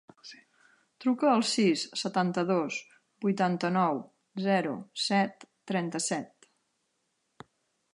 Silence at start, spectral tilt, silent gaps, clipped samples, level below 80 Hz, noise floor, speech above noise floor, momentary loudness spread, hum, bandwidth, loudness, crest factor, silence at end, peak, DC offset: 0.25 s; -4.5 dB/octave; none; under 0.1%; -80 dBFS; -78 dBFS; 49 dB; 12 LU; none; 11.5 kHz; -29 LUFS; 18 dB; 1.65 s; -12 dBFS; under 0.1%